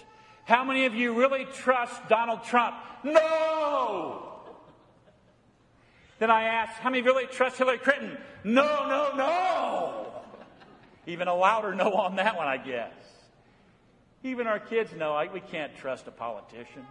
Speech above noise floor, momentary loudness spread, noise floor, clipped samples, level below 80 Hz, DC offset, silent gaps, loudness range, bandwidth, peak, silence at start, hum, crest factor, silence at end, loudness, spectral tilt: 35 dB; 16 LU; -62 dBFS; under 0.1%; -72 dBFS; under 0.1%; none; 8 LU; 11 kHz; -4 dBFS; 0.45 s; none; 24 dB; 0.05 s; -27 LUFS; -4.5 dB/octave